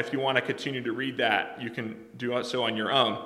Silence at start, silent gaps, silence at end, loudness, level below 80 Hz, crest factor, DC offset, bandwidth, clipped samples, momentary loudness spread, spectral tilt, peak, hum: 0 s; none; 0 s; -28 LUFS; -74 dBFS; 22 dB; under 0.1%; 14.5 kHz; under 0.1%; 10 LU; -4.5 dB/octave; -8 dBFS; none